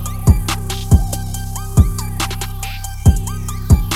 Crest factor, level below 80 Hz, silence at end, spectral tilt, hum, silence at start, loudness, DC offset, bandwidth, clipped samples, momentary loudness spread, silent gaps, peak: 16 dB; -20 dBFS; 0 s; -5.5 dB/octave; none; 0 s; -18 LUFS; under 0.1%; 16.5 kHz; under 0.1%; 9 LU; none; 0 dBFS